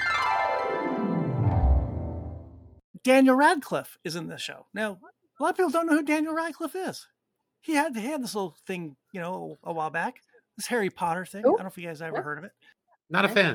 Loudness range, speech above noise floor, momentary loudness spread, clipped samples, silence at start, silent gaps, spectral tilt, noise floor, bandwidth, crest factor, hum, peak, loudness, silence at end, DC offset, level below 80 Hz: 7 LU; 49 dB; 14 LU; under 0.1%; 0 s; 2.84-2.94 s; -5.5 dB/octave; -76 dBFS; 19 kHz; 20 dB; none; -8 dBFS; -27 LUFS; 0 s; under 0.1%; -38 dBFS